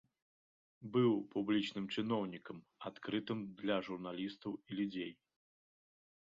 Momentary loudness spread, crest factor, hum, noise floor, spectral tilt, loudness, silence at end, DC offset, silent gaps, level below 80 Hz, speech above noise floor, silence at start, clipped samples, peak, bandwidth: 14 LU; 20 dB; none; under -90 dBFS; -5 dB/octave; -39 LUFS; 1.2 s; under 0.1%; none; -80 dBFS; over 51 dB; 0.8 s; under 0.1%; -20 dBFS; 7.4 kHz